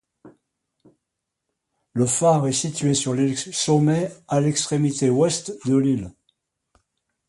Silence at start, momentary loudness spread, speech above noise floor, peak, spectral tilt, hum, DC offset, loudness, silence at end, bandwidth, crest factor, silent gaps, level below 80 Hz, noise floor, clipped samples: 0.25 s; 6 LU; 61 dB; -6 dBFS; -5 dB/octave; none; under 0.1%; -21 LUFS; 1.2 s; 11.5 kHz; 16 dB; none; -58 dBFS; -81 dBFS; under 0.1%